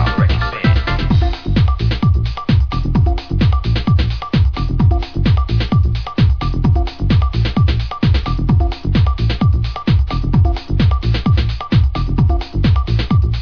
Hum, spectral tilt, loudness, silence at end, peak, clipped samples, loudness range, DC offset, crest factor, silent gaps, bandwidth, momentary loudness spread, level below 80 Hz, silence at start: none; -8 dB/octave; -16 LUFS; 0 s; -2 dBFS; under 0.1%; 0 LU; under 0.1%; 12 dB; none; 5.4 kHz; 2 LU; -18 dBFS; 0 s